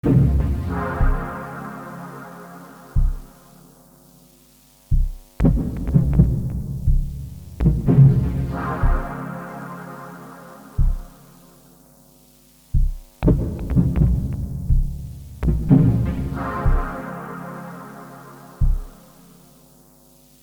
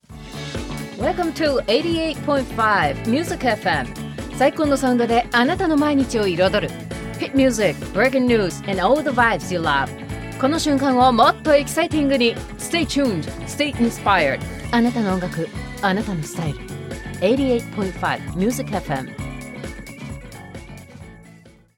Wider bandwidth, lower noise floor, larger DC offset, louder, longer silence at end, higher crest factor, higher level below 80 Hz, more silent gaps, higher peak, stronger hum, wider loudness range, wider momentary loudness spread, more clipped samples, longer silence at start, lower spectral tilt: first, 19.5 kHz vs 17 kHz; first, -52 dBFS vs -47 dBFS; neither; about the same, -22 LUFS vs -20 LUFS; first, 1.5 s vs 0.3 s; about the same, 20 dB vs 18 dB; first, -24 dBFS vs -40 dBFS; neither; about the same, -2 dBFS vs -2 dBFS; neither; first, 13 LU vs 5 LU; first, 21 LU vs 14 LU; neither; about the same, 0.05 s vs 0.1 s; first, -9.5 dB/octave vs -5 dB/octave